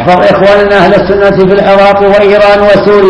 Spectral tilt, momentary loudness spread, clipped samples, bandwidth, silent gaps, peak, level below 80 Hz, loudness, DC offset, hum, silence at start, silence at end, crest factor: -7 dB/octave; 2 LU; 8%; 11 kHz; none; 0 dBFS; -30 dBFS; -4 LUFS; under 0.1%; none; 0 s; 0 s; 4 dB